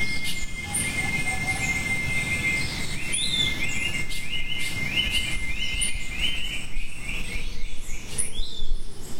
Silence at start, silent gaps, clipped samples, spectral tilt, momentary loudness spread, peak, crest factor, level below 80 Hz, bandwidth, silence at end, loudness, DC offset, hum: 0 s; none; under 0.1%; -2 dB/octave; 11 LU; -10 dBFS; 14 dB; -32 dBFS; 16 kHz; 0 s; -26 LUFS; under 0.1%; none